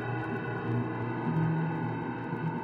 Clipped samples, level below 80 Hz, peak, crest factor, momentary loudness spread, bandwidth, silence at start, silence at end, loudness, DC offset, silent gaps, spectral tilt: under 0.1%; -62 dBFS; -20 dBFS; 12 dB; 5 LU; 4.6 kHz; 0 s; 0 s; -32 LUFS; under 0.1%; none; -10 dB/octave